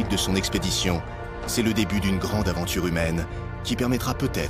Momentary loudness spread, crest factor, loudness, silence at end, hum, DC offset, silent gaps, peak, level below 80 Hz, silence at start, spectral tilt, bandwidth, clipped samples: 7 LU; 18 dB; -25 LUFS; 0 s; none; under 0.1%; none; -6 dBFS; -36 dBFS; 0 s; -4.5 dB/octave; 15.5 kHz; under 0.1%